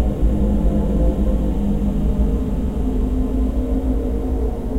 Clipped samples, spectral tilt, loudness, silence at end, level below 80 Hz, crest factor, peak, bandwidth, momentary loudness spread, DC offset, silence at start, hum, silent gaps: under 0.1%; -9.5 dB/octave; -21 LUFS; 0 s; -20 dBFS; 12 dB; -4 dBFS; 7.8 kHz; 3 LU; under 0.1%; 0 s; none; none